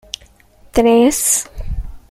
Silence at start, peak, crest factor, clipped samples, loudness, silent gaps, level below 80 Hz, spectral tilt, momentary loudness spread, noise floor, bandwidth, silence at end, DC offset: 0.75 s; -2 dBFS; 16 dB; under 0.1%; -13 LUFS; none; -30 dBFS; -3.5 dB/octave; 19 LU; -47 dBFS; 16 kHz; 0.1 s; under 0.1%